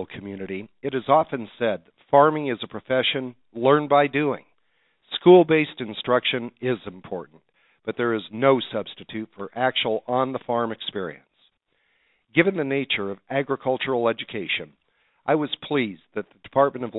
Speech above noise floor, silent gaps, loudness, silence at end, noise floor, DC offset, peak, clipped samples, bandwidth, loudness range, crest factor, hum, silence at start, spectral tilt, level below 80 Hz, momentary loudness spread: 46 dB; none; -23 LUFS; 0 s; -69 dBFS; under 0.1%; -2 dBFS; under 0.1%; 4.1 kHz; 6 LU; 22 dB; none; 0 s; -10 dB/octave; -66 dBFS; 16 LU